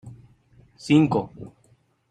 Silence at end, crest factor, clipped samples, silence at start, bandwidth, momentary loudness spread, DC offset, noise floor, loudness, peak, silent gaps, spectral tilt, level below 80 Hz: 0.65 s; 20 dB; under 0.1%; 0.05 s; 9.6 kHz; 25 LU; under 0.1%; -62 dBFS; -21 LUFS; -6 dBFS; none; -7 dB/octave; -58 dBFS